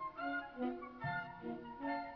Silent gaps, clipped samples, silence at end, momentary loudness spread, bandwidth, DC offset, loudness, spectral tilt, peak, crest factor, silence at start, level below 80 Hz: none; under 0.1%; 0 s; 5 LU; 5.4 kHz; under 0.1%; -43 LUFS; -4.5 dB/octave; -28 dBFS; 14 dB; 0 s; -70 dBFS